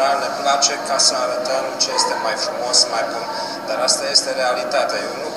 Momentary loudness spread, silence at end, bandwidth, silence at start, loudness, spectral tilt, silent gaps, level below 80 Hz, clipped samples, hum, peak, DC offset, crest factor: 9 LU; 0 s; 15.5 kHz; 0 s; -18 LUFS; 0 dB/octave; none; -76 dBFS; under 0.1%; none; 0 dBFS; 0.1%; 18 dB